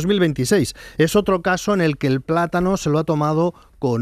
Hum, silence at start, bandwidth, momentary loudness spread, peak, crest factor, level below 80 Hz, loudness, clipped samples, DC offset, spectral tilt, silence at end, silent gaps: none; 0 s; 15.5 kHz; 5 LU; -4 dBFS; 14 dB; -44 dBFS; -19 LUFS; under 0.1%; under 0.1%; -6 dB/octave; 0 s; none